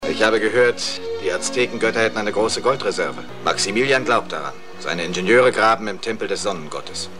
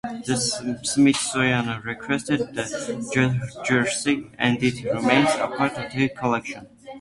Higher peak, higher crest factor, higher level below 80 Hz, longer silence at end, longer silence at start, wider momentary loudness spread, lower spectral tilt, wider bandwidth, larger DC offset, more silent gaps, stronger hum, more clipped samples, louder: about the same, -2 dBFS vs -2 dBFS; about the same, 18 dB vs 22 dB; second, -60 dBFS vs -54 dBFS; about the same, 0 s vs 0 s; about the same, 0 s vs 0.05 s; about the same, 11 LU vs 10 LU; second, -3 dB/octave vs -4.5 dB/octave; first, 13 kHz vs 11.5 kHz; first, 2% vs under 0.1%; neither; neither; neither; first, -20 LUFS vs -23 LUFS